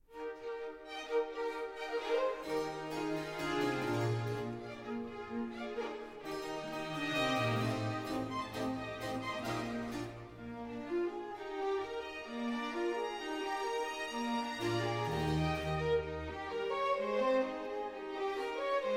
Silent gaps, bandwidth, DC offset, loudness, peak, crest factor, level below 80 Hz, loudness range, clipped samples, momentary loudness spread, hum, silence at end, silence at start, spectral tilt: none; 16 kHz; under 0.1%; -37 LUFS; -22 dBFS; 16 dB; -58 dBFS; 4 LU; under 0.1%; 9 LU; none; 0 s; 0.1 s; -5.5 dB/octave